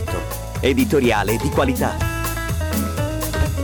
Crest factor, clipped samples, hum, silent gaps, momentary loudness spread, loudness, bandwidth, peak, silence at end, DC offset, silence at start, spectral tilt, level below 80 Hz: 14 dB; under 0.1%; none; none; 7 LU; -20 LUFS; over 20 kHz; -6 dBFS; 0 s; under 0.1%; 0 s; -5.5 dB/octave; -28 dBFS